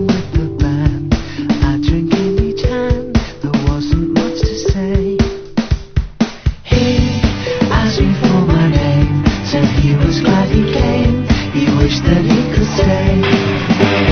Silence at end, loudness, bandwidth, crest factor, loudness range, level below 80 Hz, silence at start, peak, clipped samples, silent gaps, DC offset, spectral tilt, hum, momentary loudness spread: 0 s; -14 LUFS; 6.6 kHz; 12 dB; 3 LU; -20 dBFS; 0 s; 0 dBFS; under 0.1%; none; under 0.1%; -7 dB/octave; none; 6 LU